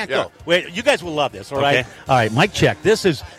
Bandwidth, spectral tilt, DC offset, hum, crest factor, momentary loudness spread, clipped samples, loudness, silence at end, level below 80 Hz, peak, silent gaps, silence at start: 16 kHz; -4.5 dB/octave; under 0.1%; none; 16 dB; 6 LU; under 0.1%; -18 LUFS; 0.05 s; -46 dBFS; -2 dBFS; none; 0 s